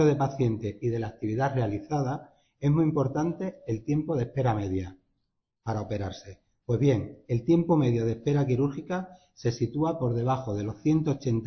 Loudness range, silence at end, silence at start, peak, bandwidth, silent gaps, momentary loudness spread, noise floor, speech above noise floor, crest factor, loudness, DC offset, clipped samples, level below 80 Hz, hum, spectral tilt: 4 LU; 0 s; 0 s; -12 dBFS; 6.4 kHz; none; 10 LU; -79 dBFS; 52 dB; 16 dB; -28 LUFS; under 0.1%; under 0.1%; -52 dBFS; none; -8.5 dB/octave